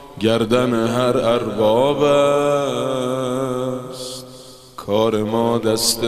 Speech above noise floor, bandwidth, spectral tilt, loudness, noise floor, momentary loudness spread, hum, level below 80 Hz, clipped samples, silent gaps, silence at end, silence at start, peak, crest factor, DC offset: 23 dB; 15.5 kHz; -4.5 dB/octave; -18 LUFS; -40 dBFS; 14 LU; none; -50 dBFS; under 0.1%; none; 0 s; 0 s; -2 dBFS; 16 dB; under 0.1%